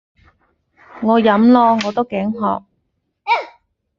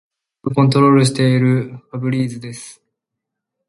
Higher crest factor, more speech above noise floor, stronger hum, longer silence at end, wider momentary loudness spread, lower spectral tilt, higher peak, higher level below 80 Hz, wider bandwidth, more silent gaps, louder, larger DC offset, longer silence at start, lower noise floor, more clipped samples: about the same, 16 dB vs 16 dB; second, 56 dB vs 65 dB; neither; second, 0.5 s vs 1 s; second, 14 LU vs 18 LU; about the same, -6.5 dB/octave vs -6.5 dB/octave; about the same, -2 dBFS vs 0 dBFS; about the same, -58 dBFS vs -58 dBFS; second, 7.2 kHz vs 11.5 kHz; neither; about the same, -16 LUFS vs -15 LUFS; neither; first, 0.95 s vs 0.45 s; second, -70 dBFS vs -81 dBFS; neither